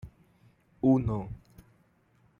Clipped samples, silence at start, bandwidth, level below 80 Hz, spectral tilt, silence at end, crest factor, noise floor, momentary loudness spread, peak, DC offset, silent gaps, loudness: under 0.1%; 0.05 s; 3.7 kHz; -52 dBFS; -11 dB/octave; 1.05 s; 20 dB; -66 dBFS; 23 LU; -14 dBFS; under 0.1%; none; -28 LUFS